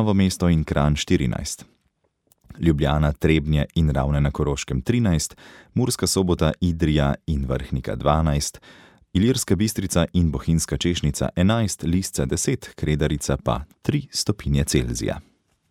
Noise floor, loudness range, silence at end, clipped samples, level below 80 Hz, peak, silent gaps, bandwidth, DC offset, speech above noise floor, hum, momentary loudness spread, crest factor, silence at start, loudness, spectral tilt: -69 dBFS; 2 LU; 0.5 s; under 0.1%; -32 dBFS; -4 dBFS; none; 16 kHz; under 0.1%; 48 dB; none; 6 LU; 18 dB; 0 s; -22 LUFS; -5.5 dB/octave